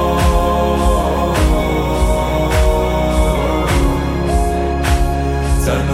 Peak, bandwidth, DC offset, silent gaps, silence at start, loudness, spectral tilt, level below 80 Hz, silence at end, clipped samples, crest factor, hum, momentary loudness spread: -2 dBFS; 16 kHz; under 0.1%; none; 0 s; -16 LUFS; -6 dB/octave; -18 dBFS; 0 s; under 0.1%; 12 dB; none; 3 LU